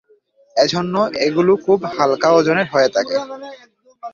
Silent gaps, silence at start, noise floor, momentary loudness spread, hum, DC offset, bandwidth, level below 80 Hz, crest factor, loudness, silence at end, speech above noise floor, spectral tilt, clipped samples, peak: none; 0.55 s; -55 dBFS; 15 LU; none; under 0.1%; 7.4 kHz; -60 dBFS; 16 dB; -16 LUFS; 0.05 s; 39 dB; -5 dB/octave; under 0.1%; -2 dBFS